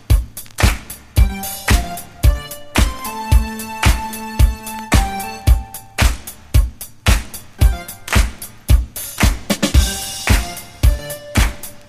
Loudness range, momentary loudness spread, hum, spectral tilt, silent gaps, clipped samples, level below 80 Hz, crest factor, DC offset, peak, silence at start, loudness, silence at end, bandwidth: 1 LU; 9 LU; none; -4.5 dB/octave; none; under 0.1%; -18 dBFS; 16 dB; under 0.1%; 0 dBFS; 0.1 s; -18 LUFS; 0.05 s; 15.5 kHz